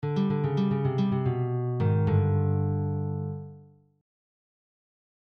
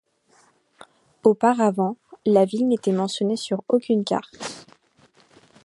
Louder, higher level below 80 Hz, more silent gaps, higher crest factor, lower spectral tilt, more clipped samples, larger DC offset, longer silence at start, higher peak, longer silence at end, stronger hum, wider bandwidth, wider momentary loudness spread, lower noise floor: second, -27 LUFS vs -22 LUFS; first, -60 dBFS vs -72 dBFS; neither; second, 14 dB vs 20 dB; first, -10.5 dB/octave vs -6 dB/octave; neither; neither; second, 0 s vs 1.25 s; second, -14 dBFS vs -4 dBFS; first, 1.65 s vs 1.05 s; first, 50 Hz at -50 dBFS vs none; second, 5.6 kHz vs 11.5 kHz; second, 9 LU vs 12 LU; second, -52 dBFS vs -60 dBFS